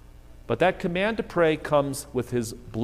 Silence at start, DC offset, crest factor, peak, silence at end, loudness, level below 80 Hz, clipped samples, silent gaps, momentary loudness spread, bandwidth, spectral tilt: 0.15 s; under 0.1%; 18 dB; -8 dBFS; 0 s; -25 LUFS; -48 dBFS; under 0.1%; none; 7 LU; 15.5 kHz; -5.5 dB/octave